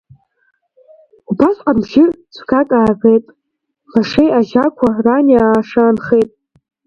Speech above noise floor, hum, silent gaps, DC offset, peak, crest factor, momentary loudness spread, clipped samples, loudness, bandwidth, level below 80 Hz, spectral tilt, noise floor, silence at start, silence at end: 61 dB; none; none; under 0.1%; 0 dBFS; 14 dB; 6 LU; under 0.1%; -13 LUFS; 6.8 kHz; -46 dBFS; -7.5 dB/octave; -72 dBFS; 1.3 s; 0.6 s